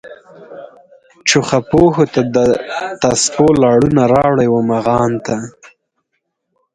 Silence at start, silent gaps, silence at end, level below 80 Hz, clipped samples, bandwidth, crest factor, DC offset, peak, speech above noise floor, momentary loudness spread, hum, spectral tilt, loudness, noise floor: 0.05 s; none; 1.25 s; -44 dBFS; under 0.1%; 11 kHz; 14 dB; under 0.1%; 0 dBFS; 58 dB; 11 LU; none; -5 dB/octave; -13 LUFS; -71 dBFS